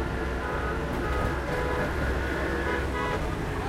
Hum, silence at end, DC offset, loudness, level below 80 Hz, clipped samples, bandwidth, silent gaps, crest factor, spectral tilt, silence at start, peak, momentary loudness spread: none; 0 s; under 0.1%; -29 LUFS; -34 dBFS; under 0.1%; 16 kHz; none; 14 dB; -6 dB/octave; 0 s; -14 dBFS; 2 LU